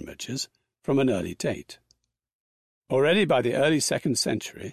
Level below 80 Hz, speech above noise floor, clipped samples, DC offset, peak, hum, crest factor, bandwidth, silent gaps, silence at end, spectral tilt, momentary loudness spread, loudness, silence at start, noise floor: -58 dBFS; 45 dB; under 0.1%; under 0.1%; -10 dBFS; none; 16 dB; 14.5 kHz; 2.35-2.82 s; 0 s; -4.5 dB/octave; 12 LU; -25 LUFS; 0 s; -69 dBFS